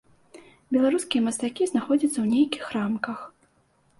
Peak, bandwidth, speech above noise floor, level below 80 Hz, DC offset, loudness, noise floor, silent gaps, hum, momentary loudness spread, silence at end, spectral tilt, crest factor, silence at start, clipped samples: -10 dBFS; 11.5 kHz; 41 dB; -68 dBFS; under 0.1%; -25 LUFS; -65 dBFS; none; none; 8 LU; 0.7 s; -4.5 dB/octave; 16 dB; 0.35 s; under 0.1%